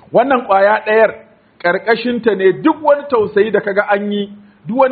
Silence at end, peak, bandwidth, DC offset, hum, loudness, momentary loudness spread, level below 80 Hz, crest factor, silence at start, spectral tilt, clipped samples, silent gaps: 0 s; 0 dBFS; 4.8 kHz; under 0.1%; none; -14 LUFS; 9 LU; -60 dBFS; 14 dB; 0.1 s; -3.5 dB/octave; under 0.1%; none